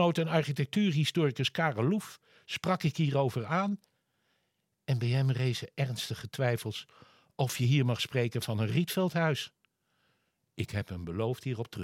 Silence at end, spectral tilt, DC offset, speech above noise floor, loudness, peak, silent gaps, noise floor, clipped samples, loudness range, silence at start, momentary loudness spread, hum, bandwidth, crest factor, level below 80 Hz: 0 s; -6 dB/octave; under 0.1%; 49 dB; -31 LUFS; -14 dBFS; none; -79 dBFS; under 0.1%; 3 LU; 0 s; 10 LU; none; 16 kHz; 18 dB; -70 dBFS